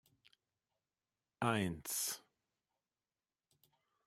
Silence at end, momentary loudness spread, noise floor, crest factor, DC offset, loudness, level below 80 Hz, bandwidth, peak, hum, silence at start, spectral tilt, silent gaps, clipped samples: 1.9 s; 5 LU; under -90 dBFS; 26 dB; under 0.1%; -39 LUFS; -76 dBFS; 16 kHz; -18 dBFS; none; 1.4 s; -3.5 dB/octave; none; under 0.1%